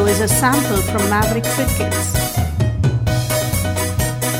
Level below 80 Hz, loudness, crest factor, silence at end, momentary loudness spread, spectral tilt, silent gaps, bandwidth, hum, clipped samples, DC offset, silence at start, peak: -30 dBFS; -17 LUFS; 14 dB; 0 s; 5 LU; -4.5 dB/octave; none; 19 kHz; none; under 0.1%; under 0.1%; 0 s; -2 dBFS